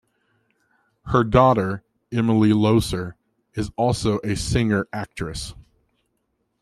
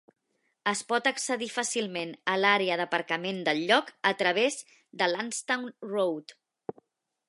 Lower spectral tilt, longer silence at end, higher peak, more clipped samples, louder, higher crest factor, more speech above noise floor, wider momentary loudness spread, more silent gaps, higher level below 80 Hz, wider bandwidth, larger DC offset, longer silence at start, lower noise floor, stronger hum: first, -6.5 dB/octave vs -2.5 dB/octave; about the same, 1 s vs 0.95 s; first, -2 dBFS vs -8 dBFS; neither; first, -21 LUFS vs -28 LUFS; about the same, 20 dB vs 22 dB; first, 52 dB vs 36 dB; about the same, 15 LU vs 14 LU; neither; first, -42 dBFS vs -84 dBFS; first, 13.5 kHz vs 11.5 kHz; neither; first, 1.05 s vs 0.65 s; first, -72 dBFS vs -64 dBFS; neither